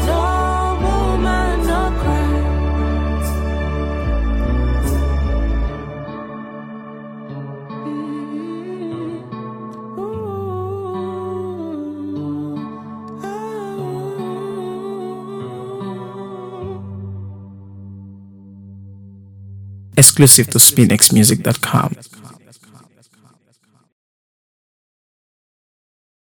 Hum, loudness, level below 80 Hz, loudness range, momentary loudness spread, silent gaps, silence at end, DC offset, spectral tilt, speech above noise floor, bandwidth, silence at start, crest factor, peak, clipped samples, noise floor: none; -16 LUFS; -26 dBFS; 19 LU; 23 LU; none; 3.5 s; under 0.1%; -4 dB/octave; 47 dB; 18 kHz; 0 s; 20 dB; 0 dBFS; 0.1%; -58 dBFS